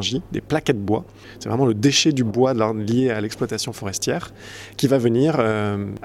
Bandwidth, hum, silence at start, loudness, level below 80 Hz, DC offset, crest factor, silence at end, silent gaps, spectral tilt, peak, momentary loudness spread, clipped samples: 15.5 kHz; none; 0 s; -21 LUFS; -52 dBFS; under 0.1%; 16 dB; 0 s; none; -5 dB/octave; -4 dBFS; 11 LU; under 0.1%